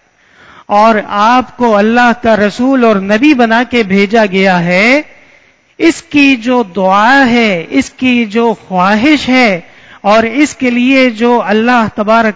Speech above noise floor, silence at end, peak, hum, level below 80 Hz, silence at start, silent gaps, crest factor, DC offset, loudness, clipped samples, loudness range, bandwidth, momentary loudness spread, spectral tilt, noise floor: 37 dB; 0 s; 0 dBFS; none; -44 dBFS; 0.7 s; none; 10 dB; under 0.1%; -9 LUFS; 1%; 1 LU; 8 kHz; 5 LU; -5.5 dB/octave; -46 dBFS